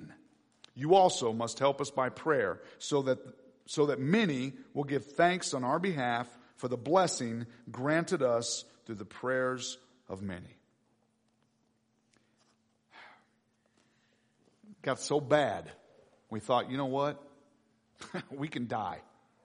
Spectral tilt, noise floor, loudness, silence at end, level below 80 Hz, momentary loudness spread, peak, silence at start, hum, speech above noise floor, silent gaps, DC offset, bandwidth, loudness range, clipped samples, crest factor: -4.5 dB/octave; -74 dBFS; -32 LUFS; 0.45 s; -76 dBFS; 15 LU; -12 dBFS; 0 s; none; 43 dB; none; under 0.1%; 10.5 kHz; 9 LU; under 0.1%; 22 dB